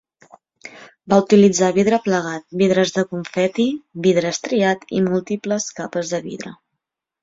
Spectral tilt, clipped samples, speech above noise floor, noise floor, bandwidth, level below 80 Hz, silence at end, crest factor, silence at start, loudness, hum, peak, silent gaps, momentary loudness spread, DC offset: -5 dB/octave; under 0.1%; 62 dB; -80 dBFS; 7.8 kHz; -60 dBFS; 0.7 s; 18 dB; 0.65 s; -18 LUFS; none; -2 dBFS; none; 13 LU; under 0.1%